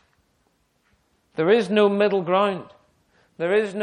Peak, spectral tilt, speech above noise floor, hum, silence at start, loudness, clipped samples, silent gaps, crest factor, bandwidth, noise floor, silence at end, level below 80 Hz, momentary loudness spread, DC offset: -6 dBFS; -6.5 dB/octave; 47 dB; none; 1.4 s; -21 LUFS; under 0.1%; none; 18 dB; 10 kHz; -67 dBFS; 0 s; -70 dBFS; 12 LU; under 0.1%